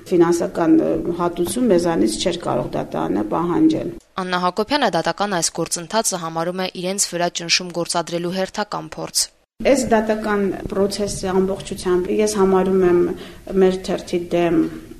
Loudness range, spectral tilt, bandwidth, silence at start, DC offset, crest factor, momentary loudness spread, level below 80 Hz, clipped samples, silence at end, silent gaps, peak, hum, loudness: 2 LU; -4 dB/octave; 13.5 kHz; 0 s; under 0.1%; 18 dB; 8 LU; -44 dBFS; under 0.1%; 0 s; none; -2 dBFS; none; -20 LUFS